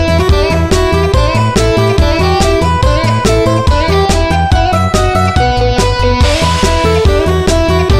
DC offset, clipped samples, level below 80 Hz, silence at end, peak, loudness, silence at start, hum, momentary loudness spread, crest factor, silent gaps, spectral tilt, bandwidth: 2%; under 0.1%; -16 dBFS; 0 s; 0 dBFS; -10 LUFS; 0 s; none; 1 LU; 10 dB; none; -5.5 dB/octave; 14.5 kHz